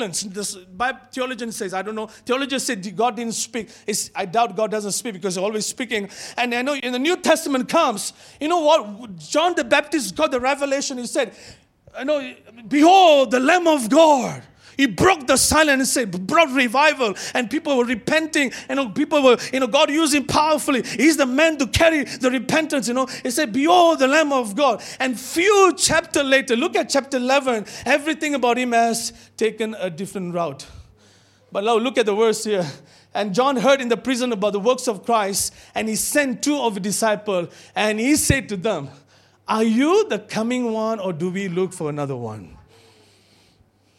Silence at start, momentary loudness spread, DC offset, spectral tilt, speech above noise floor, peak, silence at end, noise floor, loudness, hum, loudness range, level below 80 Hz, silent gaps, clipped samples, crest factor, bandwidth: 0 s; 11 LU; under 0.1%; -3.5 dB/octave; 38 dB; -2 dBFS; 1.45 s; -58 dBFS; -19 LUFS; none; 7 LU; -50 dBFS; none; under 0.1%; 18 dB; 16.5 kHz